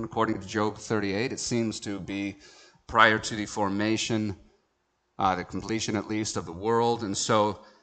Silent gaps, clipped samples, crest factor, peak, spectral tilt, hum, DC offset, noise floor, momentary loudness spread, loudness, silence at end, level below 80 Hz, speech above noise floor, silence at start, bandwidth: none; under 0.1%; 26 dB; -2 dBFS; -4 dB/octave; none; under 0.1%; -74 dBFS; 11 LU; -27 LUFS; 0.2 s; -58 dBFS; 47 dB; 0 s; 9.2 kHz